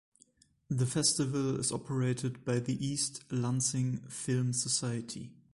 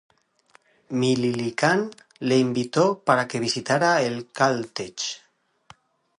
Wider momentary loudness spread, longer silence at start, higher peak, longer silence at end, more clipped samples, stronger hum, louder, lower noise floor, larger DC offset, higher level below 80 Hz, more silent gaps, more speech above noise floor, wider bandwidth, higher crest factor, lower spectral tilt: about the same, 9 LU vs 10 LU; second, 0.7 s vs 0.9 s; second, -16 dBFS vs -4 dBFS; second, 0.2 s vs 1 s; neither; neither; second, -32 LUFS vs -23 LUFS; first, -66 dBFS vs -60 dBFS; neither; about the same, -64 dBFS vs -68 dBFS; neither; about the same, 34 dB vs 37 dB; about the same, 11.5 kHz vs 11 kHz; about the same, 18 dB vs 20 dB; about the same, -4.5 dB/octave vs -4.5 dB/octave